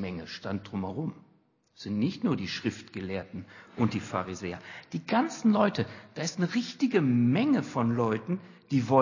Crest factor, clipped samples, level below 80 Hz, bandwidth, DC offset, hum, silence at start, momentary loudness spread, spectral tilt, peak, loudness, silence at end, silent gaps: 22 dB; under 0.1%; -60 dBFS; 7.4 kHz; under 0.1%; none; 0 s; 14 LU; -6.5 dB/octave; -8 dBFS; -30 LUFS; 0 s; none